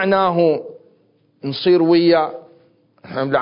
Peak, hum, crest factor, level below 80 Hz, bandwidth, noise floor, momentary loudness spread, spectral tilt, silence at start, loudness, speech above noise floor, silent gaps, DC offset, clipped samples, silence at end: -4 dBFS; none; 14 dB; -62 dBFS; 5.4 kHz; -58 dBFS; 17 LU; -11 dB/octave; 0 s; -16 LUFS; 42 dB; none; under 0.1%; under 0.1%; 0 s